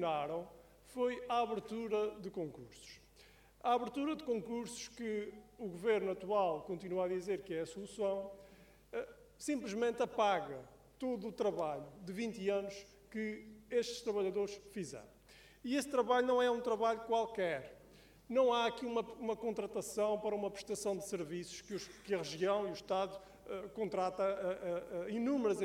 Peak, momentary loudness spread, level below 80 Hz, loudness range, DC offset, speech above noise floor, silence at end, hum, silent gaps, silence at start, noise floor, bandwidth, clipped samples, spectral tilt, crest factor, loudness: -20 dBFS; 13 LU; -70 dBFS; 5 LU; under 0.1%; 26 dB; 0 s; none; none; 0 s; -64 dBFS; 16.5 kHz; under 0.1%; -4.5 dB/octave; 20 dB; -38 LUFS